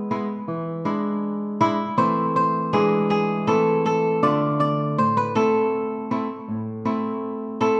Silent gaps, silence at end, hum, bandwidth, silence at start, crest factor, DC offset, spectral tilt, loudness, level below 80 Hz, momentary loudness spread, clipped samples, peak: none; 0 s; none; 7.8 kHz; 0 s; 16 dB; under 0.1%; -7.5 dB/octave; -22 LUFS; -66 dBFS; 8 LU; under 0.1%; -6 dBFS